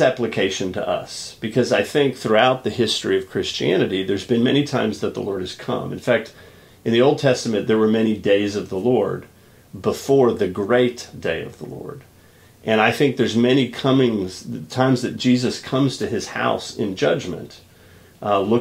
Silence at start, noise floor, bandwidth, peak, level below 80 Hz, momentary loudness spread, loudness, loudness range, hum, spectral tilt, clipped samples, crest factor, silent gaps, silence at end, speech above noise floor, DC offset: 0 s; -50 dBFS; 16 kHz; -2 dBFS; -56 dBFS; 12 LU; -20 LUFS; 3 LU; none; -5.5 dB/octave; under 0.1%; 18 dB; none; 0 s; 30 dB; under 0.1%